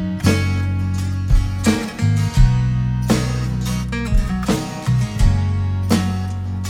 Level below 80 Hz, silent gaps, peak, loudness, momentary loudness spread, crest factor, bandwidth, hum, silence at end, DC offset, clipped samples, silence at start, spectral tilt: -22 dBFS; none; -2 dBFS; -19 LUFS; 6 LU; 16 dB; 16 kHz; none; 0 s; under 0.1%; under 0.1%; 0 s; -6 dB/octave